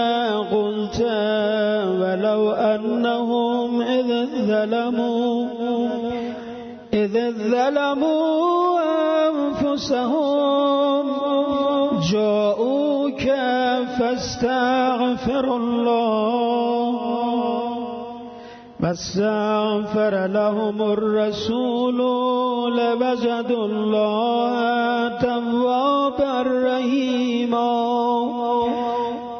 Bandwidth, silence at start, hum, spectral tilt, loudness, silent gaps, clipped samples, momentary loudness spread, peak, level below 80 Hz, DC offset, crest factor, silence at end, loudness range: 6.6 kHz; 0 s; none; -6 dB/octave; -21 LUFS; none; under 0.1%; 4 LU; -8 dBFS; -54 dBFS; under 0.1%; 12 dB; 0 s; 3 LU